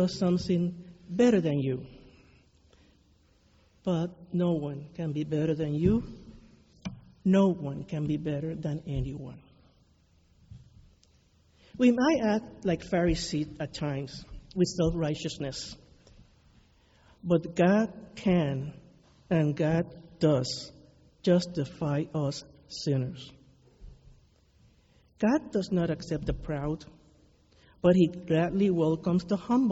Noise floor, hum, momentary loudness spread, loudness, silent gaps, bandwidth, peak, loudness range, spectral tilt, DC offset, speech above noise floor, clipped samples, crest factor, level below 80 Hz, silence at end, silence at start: -64 dBFS; none; 16 LU; -29 LUFS; none; 8 kHz; -10 dBFS; 6 LU; -7 dB/octave; under 0.1%; 36 dB; under 0.1%; 20 dB; -50 dBFS; 0 s; 0 s